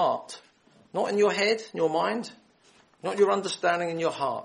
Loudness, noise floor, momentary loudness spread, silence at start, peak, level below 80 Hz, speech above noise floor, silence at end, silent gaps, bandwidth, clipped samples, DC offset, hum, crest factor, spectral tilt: -27 LUFS; -60 dBFS; 12 LU; 0 s; -10 dBFS; -76 dBFS; 34 dB; 0 s; none; 11.5 kHz; under 0.1%; under 0.1%; none; 18 dB; -4 dB/octave